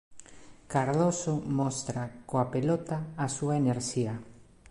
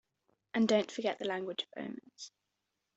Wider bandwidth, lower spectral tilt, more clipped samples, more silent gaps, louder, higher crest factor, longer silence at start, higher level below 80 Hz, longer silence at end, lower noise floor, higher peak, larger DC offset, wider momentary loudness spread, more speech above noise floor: first, 11.5 kHz vs 8 kHz; first, -6 dB/octave vs -4.5 dB/octave; neither; neither; first, -30 LUFS vs -35 LUFS; about the same, 18 dB vs 20 dB; second, 0.1 s vs 0.55 s; first, -60 dBFS vs -80 dBFS; second, 0.3 s vs 0.7 s; second, -51 dBFS vs -85 dBFS; about the same, -14 dBFS vs -16 dBFS; neither; second, 8 LU vs 20 LU; second, 22 dB vs 51 dB